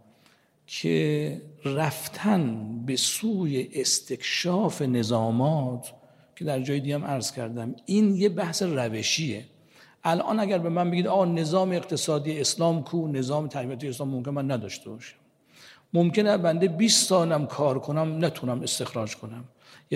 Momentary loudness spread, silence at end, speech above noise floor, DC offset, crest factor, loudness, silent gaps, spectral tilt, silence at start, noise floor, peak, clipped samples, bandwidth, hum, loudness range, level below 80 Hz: 11 LU; 0 s; 36 dB; under 0.1%; 18 dB; -26 LUFS; none; -4.5 dB/octave; 0.7 s; -62 dBFS; -8 dBFS; under 0.1%; 16 kHz; none; 4 LU; -72 dBFS